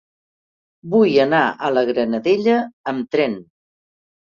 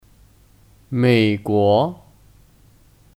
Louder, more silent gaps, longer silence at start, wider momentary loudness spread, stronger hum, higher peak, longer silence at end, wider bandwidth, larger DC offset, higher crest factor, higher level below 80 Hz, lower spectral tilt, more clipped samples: about the same, -18 LUFS vs -18 LUFS; first, 2.73-2.84 s vs none; about the same, 0.85 s vs 0.9 s; about the same, 9 LU vs 9 LU; neither; about the same, -2 dBFS vs -4 dBFS; second, 0.9 s vs 1.25 s; second, 7.2 kHz vs 15 kHz; neither; about the same, 18 dB vs 16 dB; second, -64 dBFS vs -56 dBFS; about the same, -7 dB/octave vs -7.5 dB/octave; neither